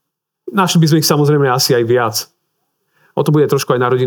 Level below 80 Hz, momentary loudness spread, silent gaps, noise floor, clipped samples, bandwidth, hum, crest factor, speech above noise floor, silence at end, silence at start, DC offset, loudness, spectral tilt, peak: -68 dBFS; 9 LU; none; -68 dBFS; under 0.1%; over 20 kHz; none; 14 dB; 56 dB; 0 s; 0.45 s; under 0.1%; -13 LUFS; -5 dB/octave; 0 dBFS